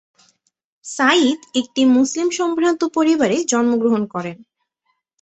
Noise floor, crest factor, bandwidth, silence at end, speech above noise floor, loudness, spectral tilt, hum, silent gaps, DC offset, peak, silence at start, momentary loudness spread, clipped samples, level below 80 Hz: -71 dBFS; 16 dB; 8.4 kHz; 0.8 s; 54 dB; -17 LUFS; -3.5 dB/octave; none; none; under 0.1%; -2 dBFS; 0.85 s; 12 LU; under 0.1%; -64 dBFS